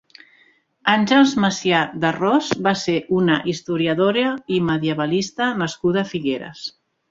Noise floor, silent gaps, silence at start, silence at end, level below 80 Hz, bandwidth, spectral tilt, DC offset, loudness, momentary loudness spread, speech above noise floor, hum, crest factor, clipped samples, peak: -57 dBFS; none; 0.85 s; 0.4 s; -58 dBFS; 7.8 kHz; -5 dB/octave; under 0.1%; -19 LUFS; 8 LU; 38 dB; none; 18 dB; under 0.1%; -2 dBFS